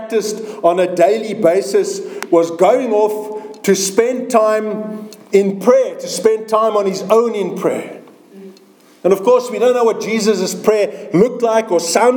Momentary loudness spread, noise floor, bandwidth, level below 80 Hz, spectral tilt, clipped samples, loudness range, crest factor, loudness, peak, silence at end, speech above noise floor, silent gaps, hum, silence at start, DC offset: 8 LU; -46 dBFS; over 20 kHz; -64 dBFS; -4.5 dB/octave; under 0.1%; 2 LU; 14 dB; -15 LUFS; 0 dBFS; 0 s; 32 dB; none; none; 0 s; under 0.1%